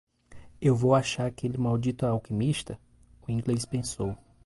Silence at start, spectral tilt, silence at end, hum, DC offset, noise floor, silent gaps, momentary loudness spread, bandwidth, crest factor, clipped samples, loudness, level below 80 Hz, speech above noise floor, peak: 0.3 s; -6.5 dB/octave; 0.3 s; none; under 0.1%; -49 dBFS; none; 11 LU; 11.5 kHz; 20 dB; under 0.1%; -28 LUFS; -52 dBFS; 21 dB; -10 dBFS